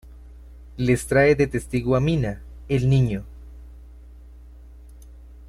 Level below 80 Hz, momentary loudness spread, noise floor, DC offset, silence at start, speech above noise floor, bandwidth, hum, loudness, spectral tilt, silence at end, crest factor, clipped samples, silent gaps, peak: -40 dBFS; 21 LU; -44 dBFS; under 0.1%; 0.05 s; 23 dB; 13 kHz; none; -22 LUFS; -7 dB/octave; 0 s; 18 dB; under 0.1%; none; -6 dBFS